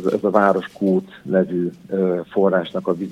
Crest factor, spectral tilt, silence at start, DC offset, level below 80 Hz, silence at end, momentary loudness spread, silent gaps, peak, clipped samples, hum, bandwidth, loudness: 18 dB; -8.5 dB/octave; 0 s; under 0.1%; -64 dBFS; 0 s; 7 LU; none; -2 dBFS; under 0.1%; none; 9.6 kHz; -20 LUFS